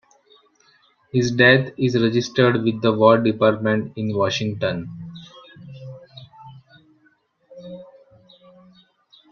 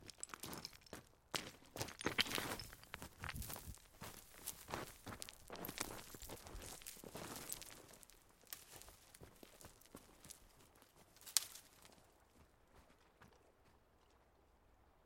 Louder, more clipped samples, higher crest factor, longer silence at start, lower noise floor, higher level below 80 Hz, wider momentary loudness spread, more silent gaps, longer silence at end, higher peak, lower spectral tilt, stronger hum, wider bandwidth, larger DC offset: first, -19 LUFS vs -47 LUFS; neither; second, 20 dB vs 42 dB; first, 1.15 s vs 0 s; second, -62 dBFS vs -72 dBFS; first, -58 dBFS vs -66 dBFS; about the same, 24 LU vs 25 LU; neither; first, 1.45 s vs 0 s; first, -2 dBFS vs -8 dBFS; first, -6 dB/octave vs -2 dB/octave; neither; second, 7 kHz vs 16.5 kHz; neither